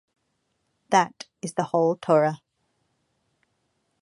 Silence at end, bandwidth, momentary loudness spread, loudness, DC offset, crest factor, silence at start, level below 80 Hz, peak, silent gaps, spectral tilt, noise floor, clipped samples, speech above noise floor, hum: 1.65 s; 11.5 kHz; 12 LU; -24 LUFS; under 0.1%; 22 dB; 0.9 s; -76 dBFS; -4 dBFS; none; -5.5 dB/octave; -74 dBFS; under 0.1%; 52 dB; none